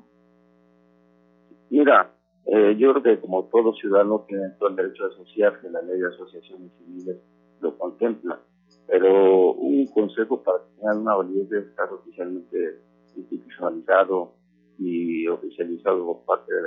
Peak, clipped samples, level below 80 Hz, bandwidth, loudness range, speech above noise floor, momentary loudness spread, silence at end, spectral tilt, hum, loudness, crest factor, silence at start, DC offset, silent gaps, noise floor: -4 dBFS; under 0.1%; -80 dBFS; 3.9 kHz; 8 LU; 37 dB; 18 LU; 0 s; -9 dB/octave; 60 Hz at -55 dBFS; -22 LUFS; 20 dB; 1.7 s; under 0.1%; none; -59 dBFS